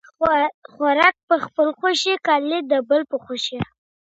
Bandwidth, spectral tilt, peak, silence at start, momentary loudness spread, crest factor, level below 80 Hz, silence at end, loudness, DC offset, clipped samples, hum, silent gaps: 8.2 kHz; -3.5 dB/octave; 0 dBFS; 0.2 s; 10 LU; 20 dB; -56 dBFS; 0.4 s; -20 LUFS; under 0.1%; under 0.1%; none; 0.54-0.62 s, 1.23-1.28 s